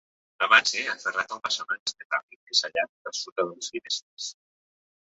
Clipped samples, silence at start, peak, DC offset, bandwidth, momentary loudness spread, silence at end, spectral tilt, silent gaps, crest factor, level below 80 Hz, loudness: under 0.1%; 0.4 s; -2 dBFS; under 0.1%; 8.4 kHz; 14 LU; 0.75 s; 0.5 dB/octave; 1.79-1.86 s, 2.05-2.10 s, 2.23-2.28 s, 2.36-2.47 s, 2.89-3.05 s, 3.32-3.36 s, 4.02-4.17 s; 26 dB; -74 dBFS; -26 LUFS